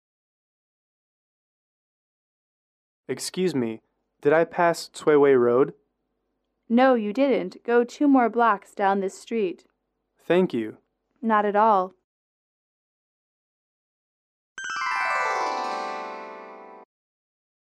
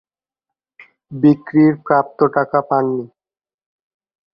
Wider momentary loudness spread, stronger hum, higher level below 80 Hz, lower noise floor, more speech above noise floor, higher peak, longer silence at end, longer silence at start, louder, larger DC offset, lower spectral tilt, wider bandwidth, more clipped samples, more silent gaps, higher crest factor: first, 16 LU vs 8 LU; neither; second, -76 dBFS vs -62 dBFS; second, -77 dBFS vs under -90 dBFS; second, 55 dB vs over 75 dB; second, -8 dBFS vs -2 dBFS; second, 0.95 s vs 1.25 s; first, 3.1 s vs 1.1 s; second, -23 LUFS vs -16 LUFS; neither; second, -5.5 dB/octave vs -11 dB/octave; first, 13.5 kHz vs 5.4 kHz; neither; first, 12.04-14.56 s vs none; about the same, 18 dB vs 18 dB